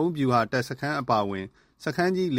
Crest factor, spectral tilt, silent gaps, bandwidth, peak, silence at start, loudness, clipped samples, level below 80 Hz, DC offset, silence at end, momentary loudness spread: 18 dB; -6.5 dB/octave; none; 16 kHz; -8 dBFS; 0 s; -26 LUFS; under 0.1%; -60 dBFS; under 0.1%; 0 s; 12 LU